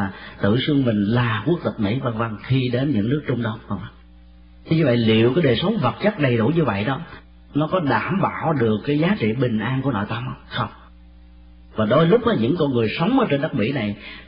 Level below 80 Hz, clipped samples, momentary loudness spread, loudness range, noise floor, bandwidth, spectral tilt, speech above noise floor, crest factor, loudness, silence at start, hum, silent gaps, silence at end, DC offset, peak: -48 dBFS; under 0.1%; 10 LU; 3 LU; -46 dBFS; 5.2 kHz; -12 dB/octave; 26 dB; 16 dB; -21 LUFS; 0 s; none; none; 0.05 s; under 0.1%; -6 dBFS